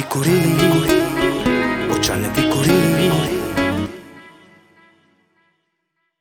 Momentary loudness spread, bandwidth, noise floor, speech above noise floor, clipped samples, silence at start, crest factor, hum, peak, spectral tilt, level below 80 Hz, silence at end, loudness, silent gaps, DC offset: 6 LU; over 20 kHz; -72 dBFS; 57 dB; under 0.1%; 0 s; 18 dB; none; -2 dBFS; -5 dB/octave; -42 dBFS; 1.9 s; -17 LUFS; none; under 0.1%